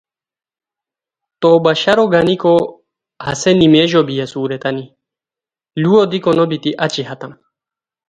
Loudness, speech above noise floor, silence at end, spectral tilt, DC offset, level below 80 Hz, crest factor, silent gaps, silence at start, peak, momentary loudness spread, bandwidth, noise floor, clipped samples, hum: -14 LUFS; 76 dB; 0.75 s; -5.5 dB/octave; under 0.1%; -52 dBFS; 16 dB; none; 1.4 s; 0 dBFS; 15 LU; 9.6 kHz; -90 dBFS; under 0.1%; none